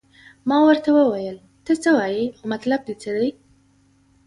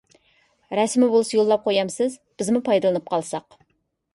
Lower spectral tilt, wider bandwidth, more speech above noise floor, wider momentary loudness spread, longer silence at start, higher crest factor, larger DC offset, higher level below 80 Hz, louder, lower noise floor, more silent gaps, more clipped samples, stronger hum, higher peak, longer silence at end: about the same, -5.5 dB/octave vs -4.5 dB/octave; about the same, 11.5 kHz vs 11.5 kHz; second, 39 dB vs 51 dB; first, 13 LU vs 10 LU; second, 0.45 s vs 0.7 s; about the same, 16 dB vs 16 dB; neither; first, -62 dBFS vs -68 dBFS; about the same, -20 LUFS vs -22 LUFS; second, -58 dBFS vs -72 dBFS; neither; neither; neither; about the same, -4 dBFS vs -6 dBFS; first, 0.95 s vs 0.75 s